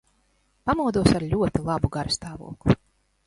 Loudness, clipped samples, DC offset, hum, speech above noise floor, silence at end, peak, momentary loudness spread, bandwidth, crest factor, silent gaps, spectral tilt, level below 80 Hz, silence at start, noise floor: -24 LUFS; under 0.1%; under 0.1%; none; 43 dB; 0.5 s; -2 dBFS; 8 LU; 11.5 kHz; 22 dB; none; -6 dB/octave; -40 dBFS; 0.65 s; -67 dBFS